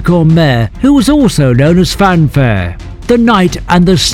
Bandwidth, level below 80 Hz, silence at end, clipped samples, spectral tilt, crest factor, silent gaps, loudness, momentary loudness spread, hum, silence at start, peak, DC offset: 16 kHz; -24 dBFS; 0 s; 2%; -6 dB/octave; 8 dB; none; -9 LUFS; 5 LU; none; 0 s; 0 dBFS; 0.3%